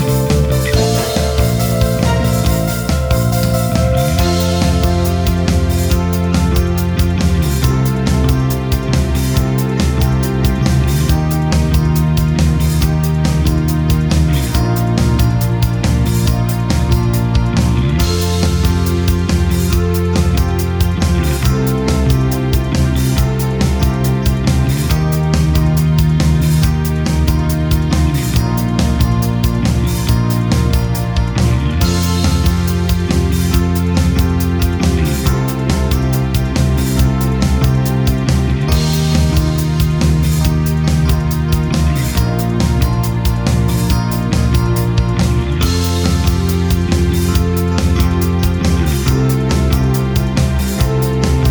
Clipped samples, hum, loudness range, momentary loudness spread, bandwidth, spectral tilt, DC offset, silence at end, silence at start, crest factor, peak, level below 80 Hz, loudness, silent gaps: under 0.1%; none; 1 LU; 2 LU; over 20 kHz; -6 dB/octave; under 0.1%; 0 s; 0 s; 12 dB; 0 dBFS; -18 dBFS; -14 LUFS; none